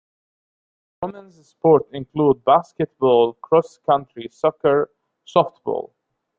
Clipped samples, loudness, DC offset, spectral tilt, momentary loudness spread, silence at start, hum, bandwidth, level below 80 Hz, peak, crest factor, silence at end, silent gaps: under 0.1%; -19 LUFS; under 0.1%; -7.5 dB/octave; 15 LU; 1 s; none; 7.4 kHz; -60 dBFS; -2 dBFS; 18 dB; 0.55 s; none